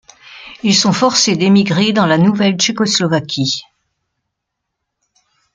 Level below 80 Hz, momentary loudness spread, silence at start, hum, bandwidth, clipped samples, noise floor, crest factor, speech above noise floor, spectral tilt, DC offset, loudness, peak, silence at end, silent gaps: -56 dBFS; 7 LU; 0.3 s; none; 9.4 kHz; under 0.1%; -76 dBFS; 16 dB; 63 dB; -4 dB/octave; under 0.1%; -13 LUFS; 0 dBFS; 1.95 s; none